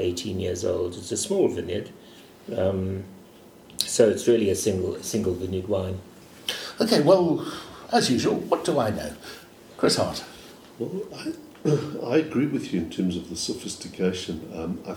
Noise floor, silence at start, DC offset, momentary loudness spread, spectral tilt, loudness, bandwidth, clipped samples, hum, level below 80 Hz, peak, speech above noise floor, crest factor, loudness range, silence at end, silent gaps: -49 dBFS; 0 s; under 0.1%; 15 LU; -5 dB/octave; -25 LUFS; 19 kHz; under 0.1%; none; -56 dBFS; -2 dBFS; 24 dB; 24 dB; 4 LU; 0 s; none